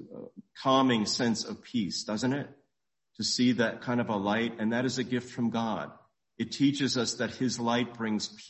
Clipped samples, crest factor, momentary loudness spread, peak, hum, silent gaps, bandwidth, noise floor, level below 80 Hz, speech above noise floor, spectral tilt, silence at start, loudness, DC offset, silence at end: under 0.1%; 18 dB; 10 LU; -12 dBFS; none; none; 8.4 kHz; -85 dBFS; -66 dBFS; 55 dB; -4.5 dB/octave; 0 s; -29 LUFS; under 0.1%; 0 s